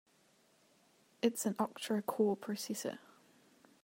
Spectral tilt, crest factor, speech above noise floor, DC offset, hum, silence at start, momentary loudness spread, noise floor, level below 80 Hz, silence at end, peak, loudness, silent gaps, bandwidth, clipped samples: -4.5 dB/octave; 22 dB; 34 dB; under 0.1%; none; 1.25 s; 7 LU; -71 dBFS; -86 dBFS; 0.85 s; -18 dBFS; -37 LUFS; none; 16 kHz; under 0.1%